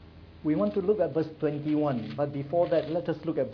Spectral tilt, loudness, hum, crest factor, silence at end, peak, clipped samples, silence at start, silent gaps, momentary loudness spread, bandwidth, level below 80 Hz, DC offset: -10 dB/octave; -29 LUFS; none; 14 dB; 0 s; -14 dBFS; under 0.1%; 0 s; none; 5 LU; 5.4 kHz; -58 dBFS; under 0.1%